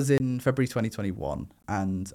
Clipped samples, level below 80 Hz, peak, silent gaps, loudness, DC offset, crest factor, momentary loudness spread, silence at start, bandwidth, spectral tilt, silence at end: under 0.1%; -50 dBFS; -12 dBFS; none; -29 LUFS; under 0.1%; 16 dB; 9 LU; 0 s; 15.5 kHz; -6.5 dB/octave; 0 s